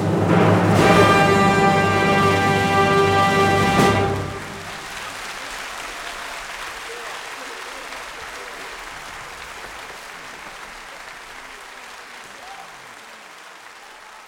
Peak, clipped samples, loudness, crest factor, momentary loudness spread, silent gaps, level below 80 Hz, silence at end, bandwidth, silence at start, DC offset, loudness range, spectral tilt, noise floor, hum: -2 dBFS; under 0.1%; -18 LUFS; 20 dB; 22 LU; none; -46 dBFS; 0 s; 17 kHz; 0 s; under 0.1%; 21 LU; -5 dB/octave; -41 dBFS; none